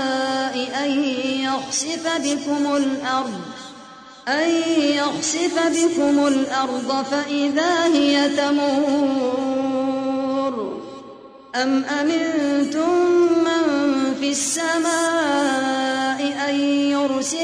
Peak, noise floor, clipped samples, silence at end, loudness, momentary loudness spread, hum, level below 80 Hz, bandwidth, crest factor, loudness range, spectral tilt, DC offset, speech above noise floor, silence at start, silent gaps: -6 dBFS; -41 dBFS; under 0.1%; 0 s; -20 LUFS; 6 LU; none; -62 dBFS; 11 kHz; 14 dB; 4 LU; -2.5 dB/octave; under 0.1%; 22 dB; 0 s; none